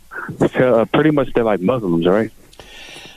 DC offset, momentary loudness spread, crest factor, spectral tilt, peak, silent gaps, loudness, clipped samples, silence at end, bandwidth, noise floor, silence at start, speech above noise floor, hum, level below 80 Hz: under 0.1%; 18 LU; 14 dB; -7.5 dB/octave; -4 dBFS; none; -16 LUFS; under 0.1%; 0.05 s; 14 kHz; -39 dBFS; 0.1 s; 23 dB; none; -40 dBFS